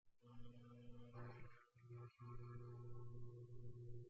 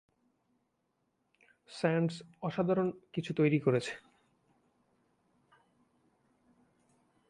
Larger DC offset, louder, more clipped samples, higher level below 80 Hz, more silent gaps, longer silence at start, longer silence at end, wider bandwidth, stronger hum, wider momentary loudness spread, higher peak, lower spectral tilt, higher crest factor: neither; second, -60 LUFS vs -33 LUFS; neither; first, -68 dBFS vs -76 dBFS; neither; second, 0.05 s vs 1.7 s; second, 0 s vs 3.3 s; second, 7 kHz vs 11.5 kHz; neither; second, 8 LU vs 13 LU; second, -44 dBFS vs -16 dBFS; about the same, -8 dB/octave vs -7 dB/octave; second, 12 dB vs 22 dB